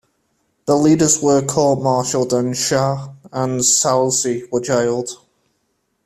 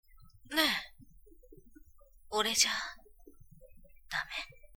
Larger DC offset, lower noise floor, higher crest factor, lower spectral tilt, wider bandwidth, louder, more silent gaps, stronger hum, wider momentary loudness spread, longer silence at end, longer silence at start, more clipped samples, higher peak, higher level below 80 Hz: neither; first, -68 dBFS vs -58 dBFS; second, 16 dB vs 28 dB; first, -4 dB/octave vs 0 dB/octave; second, 15 kHz vs over 20 kHz; first, -16 LUFS vs -32 LUFS; neither; neither; about the same, 12 LU vs 14 LU; first, 0.9 s vs 0.1 s; first, 0.65 s vs 0.2 s; neither; first, -2 dBFS vs -10 dBFS; first, -54 dBFS vs -60 dBFS